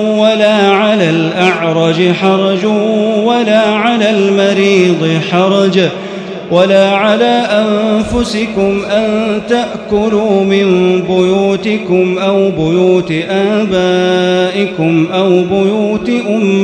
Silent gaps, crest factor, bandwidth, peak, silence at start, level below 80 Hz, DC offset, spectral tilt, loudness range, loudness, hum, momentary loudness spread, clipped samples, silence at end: none; 10 dB; 10 kHz; 0 dBFS; 0 s; -42 dBFS; under 0.1%; -6 dB/octave; 2 LU; -11 LUFS; none; 5 LU; 0.1%; 0 s